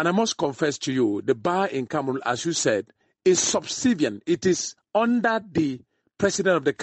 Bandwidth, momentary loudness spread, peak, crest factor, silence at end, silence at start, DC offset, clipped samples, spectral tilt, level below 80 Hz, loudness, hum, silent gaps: 8.8 kHz; 5 LU; -8 dBFS; 16 dB; 0 s; 0 s; under 0.1%; under 0.1%; -4 dB/octave; -62 dBFS; -24 LUFS; none; none